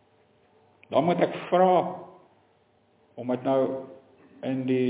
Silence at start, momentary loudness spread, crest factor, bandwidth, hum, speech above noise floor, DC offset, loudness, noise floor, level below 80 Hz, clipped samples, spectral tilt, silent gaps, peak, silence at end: 0.9 s; 16 LU; 18 dB; 4 kHz; none; 40 dB; under 0.1%; -26 LUFS; -64 dBFS; -76 dBFS; under 0.1%; -10.5 dB/octave; none; -8 dBFS; 0 s